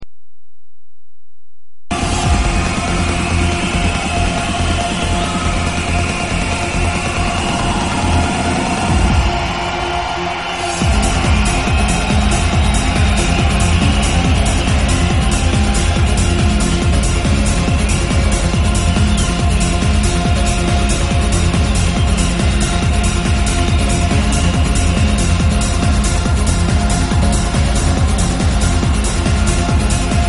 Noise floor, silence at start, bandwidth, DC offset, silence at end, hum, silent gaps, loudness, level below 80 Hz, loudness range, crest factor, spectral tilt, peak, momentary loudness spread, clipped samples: -77 dBFS; 0 s; 11.5 kHz; under 0.1%; 0 s; none; none; -15 LUFS; -18 dBFS; 3 LU; 12 dB; -4.5 dB/octave; -2 dBFS; 3 LU; under 0.1%